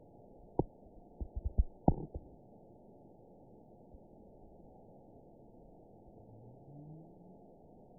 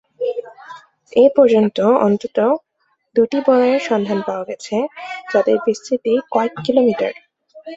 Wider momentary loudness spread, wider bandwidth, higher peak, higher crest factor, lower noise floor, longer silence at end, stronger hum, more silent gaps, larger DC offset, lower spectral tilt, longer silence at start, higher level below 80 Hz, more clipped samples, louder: first, 22 LU vs 11 LU; second, 1 kHz vs 8 kHz; second, -10 dBFS vs -2 dBFS; first, 32 dB vs 16 dB; about the same, -59 dBFS vs -59 dBFS; first, 0.65 s vs 0 s; neither; neither; neither; about the same, -5 dB/octave vs -6 dB/octave; first, 0.6 s vs 0.2 s; first, -48 dBFS vs -62 dBFS; neither; second, -40 LUFS vs -17 LUFS